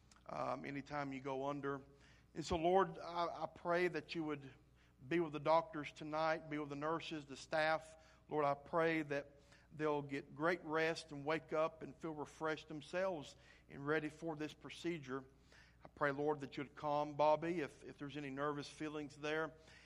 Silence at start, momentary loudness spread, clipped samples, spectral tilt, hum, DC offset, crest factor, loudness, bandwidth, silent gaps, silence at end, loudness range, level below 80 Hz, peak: 0.3 s; 12 LU; under 0.1%; -5.5 dB/octave; none; under 0.1%; 20 dB; -42 LUFS; 11.5 kHz; none; 0 s; 4 LU; -70 dBFS; -22 dBFS